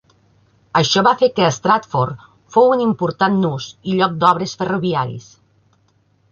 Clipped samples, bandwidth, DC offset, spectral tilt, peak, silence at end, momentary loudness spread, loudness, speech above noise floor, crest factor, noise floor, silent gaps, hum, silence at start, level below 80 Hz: under 0.1%; 7.4 kHz; under 0.1%; -5 dB/octave; -2 dBFS; 1.1 s; 9 LU; -17 LUFS; 43 dB; 16 dB; -59 dBFS; none; none; 0.75 s; -56 dBFS